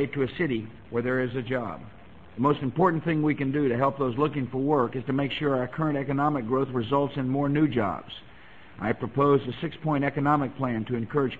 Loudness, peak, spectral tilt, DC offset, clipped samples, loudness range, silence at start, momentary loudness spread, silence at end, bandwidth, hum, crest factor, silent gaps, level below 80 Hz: -27 LUFS; -10 dBFS; -9.5 dB/octave; 0.3%; under 0.1%; 2 LU; 0 s; 7 LU; 0 s; 7.4 kHz; none; 16 dB; none; -56 dBFS